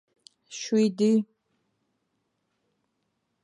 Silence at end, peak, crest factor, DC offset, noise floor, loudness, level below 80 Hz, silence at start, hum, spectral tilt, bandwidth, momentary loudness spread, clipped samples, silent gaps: 2.2 s; -14 dBFS; 16 dB; under 0.1%; -77 dBFS; -25 LUFS; -84 dBFS; 0.5 s; none; -5.5 dB/octave; 10.5 kHz; 19 LU; under 0.1%; none